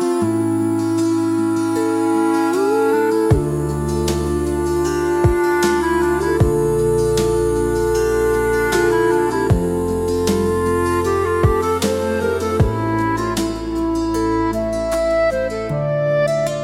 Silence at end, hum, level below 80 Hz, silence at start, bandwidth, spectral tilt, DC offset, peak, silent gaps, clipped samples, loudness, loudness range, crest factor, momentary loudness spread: 0 s; none; -32 dBFS; 0 s; 16 kHz; -6 dB/octave; under 0.1%; -2 dBFS; none; under 0.1%; -18 LUFS; 2 LU; 14 dB; 4 LU